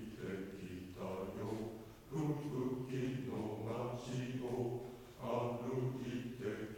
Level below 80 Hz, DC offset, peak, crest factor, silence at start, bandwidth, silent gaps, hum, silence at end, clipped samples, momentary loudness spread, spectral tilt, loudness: -66 dBFS; under 0.1%; -28 dBFS; 14 dB; 0 s; 17 kHz; none; none; 0 s; under 0.1%; 8 LU; -7 dB/octave; -43 LUFS